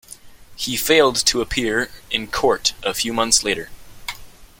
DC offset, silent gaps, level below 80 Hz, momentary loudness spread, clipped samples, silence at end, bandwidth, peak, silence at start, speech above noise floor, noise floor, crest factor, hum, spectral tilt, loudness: under 0.1%; none; -42 dBFS; 18 LU; under 0.1%; 0.15 s; 17 kHz; -2 dBFS; 0.1 s; 22 dB; -41 dBFS; 20 dB; none; -1.5 dB/octave; -19 LUFS